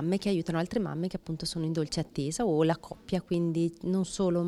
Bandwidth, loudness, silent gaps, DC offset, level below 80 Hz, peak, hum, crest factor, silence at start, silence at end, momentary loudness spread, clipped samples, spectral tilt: 13 kHz; -31 LUFS; none; under 0.1%; -56 dBFS; -14 dBFS; none; 16 dB; 0 s; 0 s; 7 LU; under 0.1%; -6 dB/octave